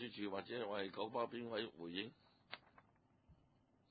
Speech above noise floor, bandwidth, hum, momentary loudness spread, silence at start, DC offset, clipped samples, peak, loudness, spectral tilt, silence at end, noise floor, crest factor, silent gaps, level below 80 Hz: 30 dB; 4.8 kHz; none; 13 LU; 0 s; under 0.1%; under 0.1%; -28 dBFS; -46 LUFS; -2.5 dB/octave; 0.55 s; -76 dBFS; 20 dB; none; -82 dBFS